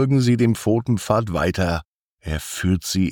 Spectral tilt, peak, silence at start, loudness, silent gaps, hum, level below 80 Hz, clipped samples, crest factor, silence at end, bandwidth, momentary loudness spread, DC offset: -6 dB/octave; -6 dBFS; 0 s; -21 LUFS; 1.85-2.18 s; none; -42 dBFS; under 0.1%; 14 dB; 0 s; 18.5 kHz; 11 LU; under 0.1%